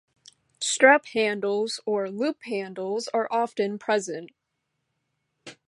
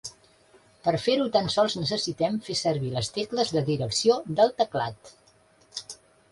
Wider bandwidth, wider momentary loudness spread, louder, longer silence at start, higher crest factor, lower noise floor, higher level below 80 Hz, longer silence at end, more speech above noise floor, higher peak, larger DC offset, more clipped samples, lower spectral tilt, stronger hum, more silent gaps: about the same, 11.5 kHz vs 11.5 kHz; about the same, 13 LU vs 15 LU; about the same, -25 LUFS vs -26 LUFS; first, 0.6 s vs 0.05 s; about the same, 24 dB vs 20 dB; first, -79 dBFS vs -60 dBFS; second, -78 dBFS vs -60 dBFS; second, 0.15 s vs 0.35 s; first, 55 dB vs 35 dB; first, -2 dBFS vs -8 dBFS; neither; neither; second, -3 dB/octave vs -4.5 dB/octave; neither; neither